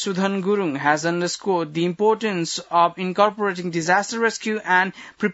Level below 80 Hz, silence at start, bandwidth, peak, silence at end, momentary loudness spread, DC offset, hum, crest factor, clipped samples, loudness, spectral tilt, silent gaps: -70 dBFS; 0 s; 8 kHz; -2 dBFS; 0 s; 6 LU; under 0.1%; none; 18 dB; under 0.1%; -21 LUFS; -4.5 dB/octave; none